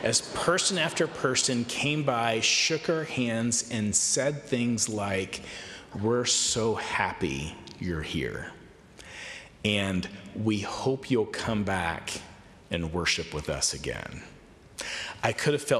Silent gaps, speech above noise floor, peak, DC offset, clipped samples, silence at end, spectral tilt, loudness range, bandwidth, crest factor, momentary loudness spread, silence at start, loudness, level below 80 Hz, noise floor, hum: none; 22 dB; -12 dBFS; under 0.1%; under 0.1%; 0 s; -3 dB/octave; 6 LU; 14 kHz; 18 dB; 15 LU; 0 s; -28 LUFS; -54 dBFS; -50 dBFS; none